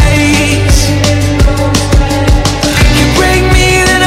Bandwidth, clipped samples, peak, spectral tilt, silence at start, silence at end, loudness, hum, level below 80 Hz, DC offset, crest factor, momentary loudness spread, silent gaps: 16.5 kHz; 0.3%; 0 dBFS; -4.5 dB/octave; 0 s; 0 s; -8 LUFS; none; -12 dBFS; under 0.1%; 8 dB; 3 LU; none